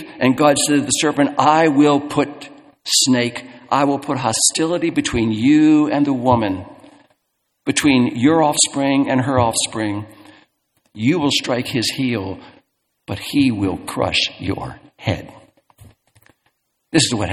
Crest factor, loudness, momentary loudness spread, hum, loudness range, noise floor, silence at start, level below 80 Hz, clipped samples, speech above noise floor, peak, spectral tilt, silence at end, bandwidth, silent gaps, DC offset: 18 dB; -17 LUFS; 13 LU; none; 6 LU; -71 dBFS; 0 s; -48 dBFS; under 0.1%; 55 dB; 0 dBFS; -4 dB/octave; 0 s; 14.5 kHz; none; under 0.1%